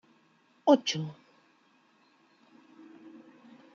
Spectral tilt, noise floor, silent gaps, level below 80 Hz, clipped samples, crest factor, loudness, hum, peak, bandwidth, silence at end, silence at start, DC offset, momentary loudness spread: -4.5 dB/octave; -66 dBFS; none; -84 dBFS; under 0.1%; 26 dB; -28 LUFS; none; -8 dBFS; 7.4 kHz; 2.6 s; 0.65 s; under 0.1%; 28 LU